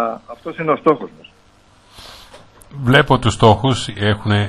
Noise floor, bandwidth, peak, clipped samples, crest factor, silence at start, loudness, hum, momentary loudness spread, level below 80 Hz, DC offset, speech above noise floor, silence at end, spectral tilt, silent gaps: -50 dBFS; 12.5 kHz; 0 dBFS; under 0.1%; 18 dB; 0 s; -16 LUFS; none; 25 LU; -40 dBFS; under 0.1%; 35 dB; 0 s; -6 dB/octave; none